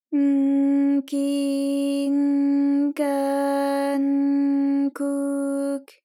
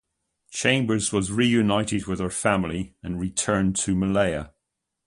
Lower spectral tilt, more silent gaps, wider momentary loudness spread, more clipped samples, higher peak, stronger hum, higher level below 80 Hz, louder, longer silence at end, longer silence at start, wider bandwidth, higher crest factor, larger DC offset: about the same, -4 dB/octave vs -4.5 dB/octave; neither; second, 5 LU vs 11 LU; neither; second, -12 dBFS vs -4 dBFS; neither; second, under -90 dBFS vs -46 dBFS; about the same, -22 LUFS vs -24 LUFS; second, 0.2 s vs 0.6 s; second, 0.1 s vs 0.5 s; first, 14 kHz vs 11.5 kHz; second, 10 dB vs 20 dB; neither